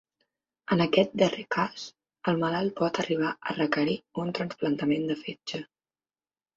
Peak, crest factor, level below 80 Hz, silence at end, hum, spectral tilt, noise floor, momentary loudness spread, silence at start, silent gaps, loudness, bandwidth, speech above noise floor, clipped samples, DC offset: -6 dBFS; 22 dB; -68 dBFS; 0.95 s; none; -6 dB/octave; under -90 dBFS; 12 LU; 0.7 s; none; -28 LUFS; 7.8 kHz; over 62 dB; under 0.1%; under 0.1%